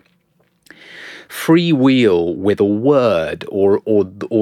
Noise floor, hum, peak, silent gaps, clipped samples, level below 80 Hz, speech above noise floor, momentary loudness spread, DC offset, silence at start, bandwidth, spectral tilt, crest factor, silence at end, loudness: -60 dBFS; none; -2 dBFS; none; under 0.1%; -54 dBFS; 46 dB; 16 LU; under 0.1%; 0.9 s; 15.5 kHz; -7 dB/octave; 14 dB; 0 s; -15 LUFS